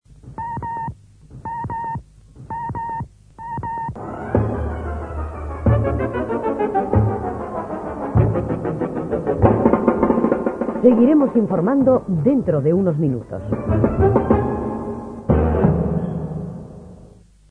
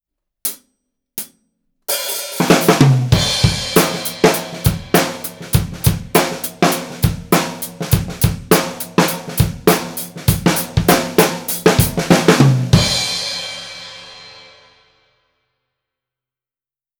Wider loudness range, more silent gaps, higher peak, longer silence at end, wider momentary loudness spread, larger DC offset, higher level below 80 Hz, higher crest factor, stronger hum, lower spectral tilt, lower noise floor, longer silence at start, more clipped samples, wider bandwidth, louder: first, 10 LU vs 4 LU; neither; about the same, 0 dBFS vs 0 dBFS; second, 0.45 s vs 2.6 s; about the same, 14 LU vs 15 LU; neither; about the same, -32 dBFS vs -34 dBFS; about the same, 20 dB vs 16 dB; neither; first, -11 dB/octave vs -4.5 dB/octave; second, -46 dBFS vs under -90 dBFS; second, 0.25 s vs 0.45 s; neither; second, 9.6 kHz vs over 20 kHz; second, -20 LUFS vs -16 LUFS